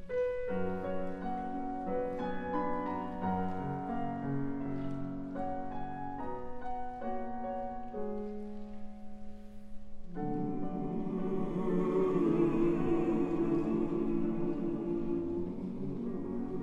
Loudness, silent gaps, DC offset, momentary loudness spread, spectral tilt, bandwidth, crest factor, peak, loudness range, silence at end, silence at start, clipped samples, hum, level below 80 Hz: -35 LUFS; none; under 0.1%; 12 LU; -9.5 dB/octave; 7 kHz; 16 dB; -18 dBFS; 10 LU; 0 s; 0 s; under 0.1%; none; -50 dBFS